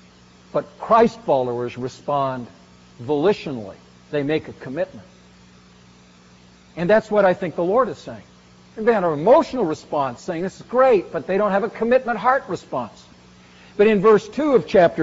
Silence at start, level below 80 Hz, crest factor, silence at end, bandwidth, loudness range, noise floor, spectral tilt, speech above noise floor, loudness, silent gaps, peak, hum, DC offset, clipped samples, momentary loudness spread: 0.55 s; -56 dBFS; 18 dB; 0 s; 7.8 kHz; 7 LU; -49 dBFS; -5 dB/octave; 30 dB; -20 LUFS; none; -4 dBFS; 60 Hz at -55 dBFS; under 0.1%; under 0.1%; 16 LU